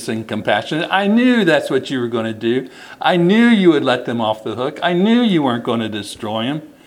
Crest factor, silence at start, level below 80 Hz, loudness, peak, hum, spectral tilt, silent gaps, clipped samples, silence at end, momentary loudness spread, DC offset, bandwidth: 16 dB; 0 s; -62 dBFS; -16 LUFS; 0 dBFS; none; -6 dB/octave; none; under 0.1%; 0.15 s; 10 LU; under 0.1%; 12.5 kHz